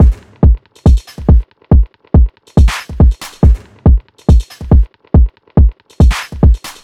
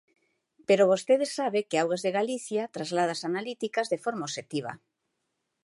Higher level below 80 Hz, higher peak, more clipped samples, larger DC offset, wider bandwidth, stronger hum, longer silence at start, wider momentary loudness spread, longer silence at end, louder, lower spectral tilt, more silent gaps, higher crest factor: first, -12 dBFS vs -82 dBFS; first, 0 dBFS vs -10 dBFS; neither; first, 0.2% vs under 0.1%; about the same, 10.5 kHz vs 11.5 kHz; neither; second, 0 s vs 0.7 s; second, 2 LU vs 12 LU; second, 0.15 s vs 0.9 s; first, -12 LUFS vs -28 LUFS; first, -7.5 dB/octave vs -4.5 dB/octave; neither; second, 10 dB vs 18 dB